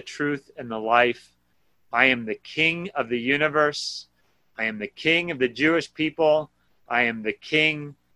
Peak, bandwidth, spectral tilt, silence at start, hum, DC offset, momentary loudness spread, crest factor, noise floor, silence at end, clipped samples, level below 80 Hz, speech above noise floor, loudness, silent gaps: -4 dBFS; 11.5 kHz; -4.5 dB/octave; 0.05 s; none; under 0.1%; 12 LU; 22 dB; -69 dBFS; 0.25 s; under 0.1%; -64 dBFS; 46 dB; -23 LUFS; none